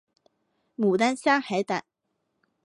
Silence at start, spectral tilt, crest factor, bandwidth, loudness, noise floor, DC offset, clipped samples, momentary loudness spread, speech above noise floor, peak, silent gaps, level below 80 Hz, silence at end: 0.8 s; -5 dB/octave; 20 dB; 11.5 kHz; -25 LUFS; -78 dBFS; under 0.1%; under 0.1%; 9 LU; 54 dB; -8 dBFS; none; -76 dBFS; 0.85 s